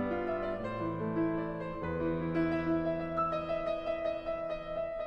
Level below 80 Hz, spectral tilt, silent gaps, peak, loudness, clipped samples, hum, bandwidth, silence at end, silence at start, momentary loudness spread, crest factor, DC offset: -52 dBFS; -9 dB/octave; none; -22 dBFS; -34 LUFS; under 0.1%; none; 5.8 kHz; 0 s; 0 s; 5 LU; 12 dB; under 0.1%